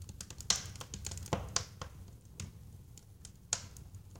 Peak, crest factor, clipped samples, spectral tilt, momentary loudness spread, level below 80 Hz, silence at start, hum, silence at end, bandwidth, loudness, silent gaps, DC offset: -12 dBFS; 32 dB; under 0.1%; -2 dB/octave; 21 LU; -54 dBFS; 0 s; none; 0 s; 17 kHz; -39 LUFS; none; under 0.1%